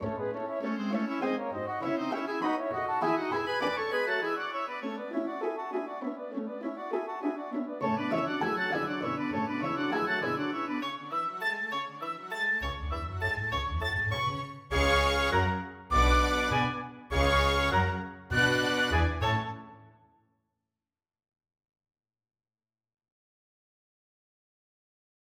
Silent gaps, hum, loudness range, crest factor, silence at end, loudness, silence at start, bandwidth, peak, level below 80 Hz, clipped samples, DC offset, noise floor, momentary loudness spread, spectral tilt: none; none; 7 LU; 20 dB; 5.45 s; -30 LUFS; 0 s; 17 kHz; -12 dBFS; -40 dBFS; under 0.1%; under 0.1%; under -90 dBFS; 10 LU; -5 dB/octave